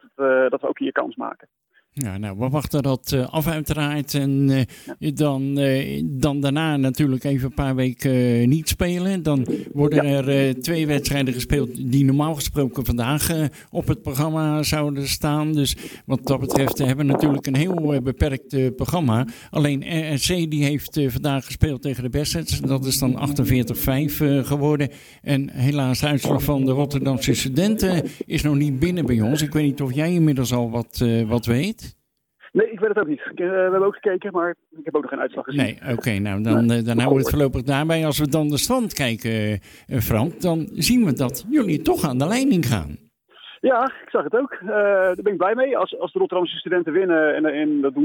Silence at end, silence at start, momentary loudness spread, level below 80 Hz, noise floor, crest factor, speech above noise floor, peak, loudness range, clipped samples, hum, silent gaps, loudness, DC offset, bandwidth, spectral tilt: 0 s; 0.2 s; 6 LU; -40 dBFS; -54 dBFS; 20 dB; 33 dB; 0 dBFS; 2 LU; under 0.1%; none; none; -21 LUFS; under 0.1%; 19 kHz; -6 dB/octave